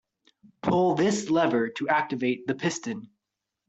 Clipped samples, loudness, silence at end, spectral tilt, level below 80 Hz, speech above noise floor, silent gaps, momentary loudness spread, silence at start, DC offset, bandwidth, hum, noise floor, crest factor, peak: under 0.1%; -26 LUFS; 0.6 s; -5 dB/octave; -64 dBFS; 60 dB; none; 10 LU; 0.65 s; under 0.1%; 8.2 kHz; none; -85 dBFS; 18 dB; -10 dBFS